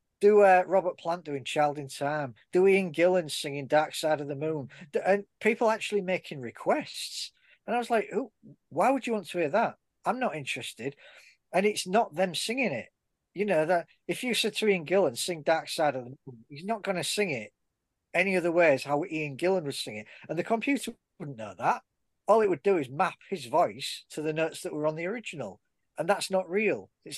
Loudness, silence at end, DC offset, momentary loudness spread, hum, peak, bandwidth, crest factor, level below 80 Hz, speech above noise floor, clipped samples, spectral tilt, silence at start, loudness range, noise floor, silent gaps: -28 LUFS; 0 s; under 0.1%; 14 LU; none; -10 dBFS; 12.5 kHz; 18 dB; -78 dBFS; 54 dB; under 0.1%; -4.5 dB/octave; 0.2 s; 4 LU; -82 dBFS; none